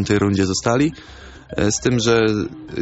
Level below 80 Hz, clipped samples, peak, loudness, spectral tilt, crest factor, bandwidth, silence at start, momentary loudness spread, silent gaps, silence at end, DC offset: -42 dBFS; under 0.1%; -4 dBFS; -19 LUFS; -5 dB/octave; 16 dB; 8.2 kHz; 0 s; 11 LU; none; 0 s; under 0.1%